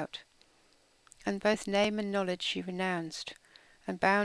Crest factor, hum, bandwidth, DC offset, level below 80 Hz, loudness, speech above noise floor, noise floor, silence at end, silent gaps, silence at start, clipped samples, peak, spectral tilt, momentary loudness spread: 22 dB; none; 11 kHz; under 0.1%; -66 dBFS; -32 LUFS; 35 dB; -66 dBFS; 0 s; none; 0 s; under 0.1%; -12 dBFS; -4.5 dB/octave; 15 LU